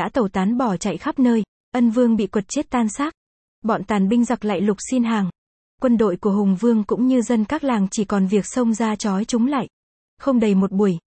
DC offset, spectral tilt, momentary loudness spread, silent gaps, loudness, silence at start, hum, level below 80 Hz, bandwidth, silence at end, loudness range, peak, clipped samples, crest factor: under 0.1%; -6 dB/octave; 6 LU; 1.48-1.72 s, 3.17-3.62 s, 5.38-5.78 s, 9.73-10.17 s; -20 LUFS; 0 s; none; -52 dBFS; 8.8 kHz; 0.2 s; 2 LU; -6 dBFS; under 0.1%; 14 dB